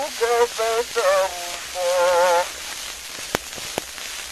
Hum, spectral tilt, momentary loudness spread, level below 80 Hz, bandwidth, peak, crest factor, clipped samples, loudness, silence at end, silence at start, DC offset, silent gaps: none; -1 dB/octave; 12 LU; -54 dBFS; 13 kHz; 0 dBFS; 22 dB; under 0.1%; -22 LUFS; 0 s; 0 s; 0.1%; none